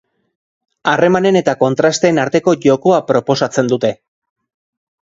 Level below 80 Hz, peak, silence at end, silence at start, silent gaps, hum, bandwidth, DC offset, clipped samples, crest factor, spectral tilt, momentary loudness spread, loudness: -56 dBFS; 0 dBFS; 1.2 s; 0.85 s; none; none; 8 kHz; under 0.1%; under 0.1%; 14 dB; -5.5 dB/octave; 5 LU; -14 LUFS